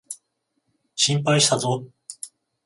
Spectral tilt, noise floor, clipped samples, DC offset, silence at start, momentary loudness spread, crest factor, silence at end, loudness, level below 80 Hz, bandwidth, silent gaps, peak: -3 dB/octave; -74 dBFS; under 0.1%; under 0.1%; 0.1 s; 21 LU; 20 dB; 0.4 s; -20 LUFS; -64 dBFS; 11.5 kHz; none; -6 dBFS